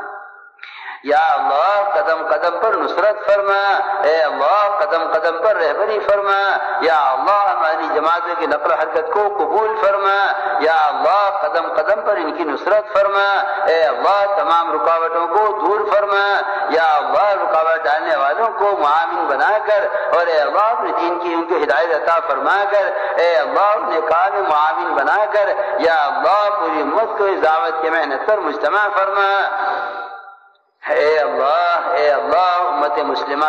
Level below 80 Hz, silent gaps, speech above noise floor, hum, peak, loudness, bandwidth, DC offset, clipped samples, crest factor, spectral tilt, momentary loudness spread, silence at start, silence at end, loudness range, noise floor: -62 dBFS; none; 34 dB; none; -6 dBFS; -16 LUFS; 7.8 kHz; under 0.1%; under 0.1%; 10 dB; -3.5 dB/octave; 3 LU; 0 s; 0 s; 1 LU; -49 dBFS